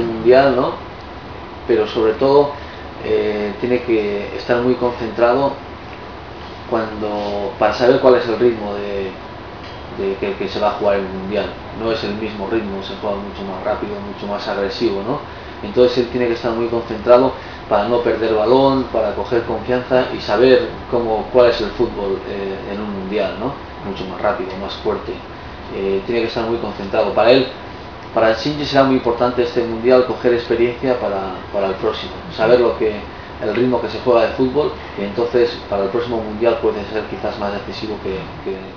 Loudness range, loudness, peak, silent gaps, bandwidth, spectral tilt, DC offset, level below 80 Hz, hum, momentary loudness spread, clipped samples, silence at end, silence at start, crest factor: 6 LU; -18 LUFS; 0 dBFS; none; 5.4 kHz; -7 dB/octave; 0.3%; -40 dBFS; none; 15 LU; under 0.1%; 0 s; 0 s; 18 dB